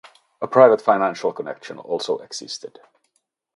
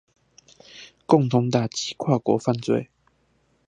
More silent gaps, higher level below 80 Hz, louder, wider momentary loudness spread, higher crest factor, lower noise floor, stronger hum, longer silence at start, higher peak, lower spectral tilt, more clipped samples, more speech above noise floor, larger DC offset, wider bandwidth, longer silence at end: neither; second, -74 dBFS vs -64 dBFS; first, -19 LUFS vs -23 LUFS; second, 19 LU vs 23 LU; about the same, 22 dB vs 22 dB; first, -70 dBFS vs -66 dBFS; neither; second, 0.4 s vs 0.75 s; about the same, 0 dBFS vs -2 dBFS; second, -4.5 dB/octave vs -6.5 dB/octave; neither; first, 51 dB vs 44 dB; neither; first, 11.5 kHz vs 10 kHz; about the same, 0.9 s vs 0.85 s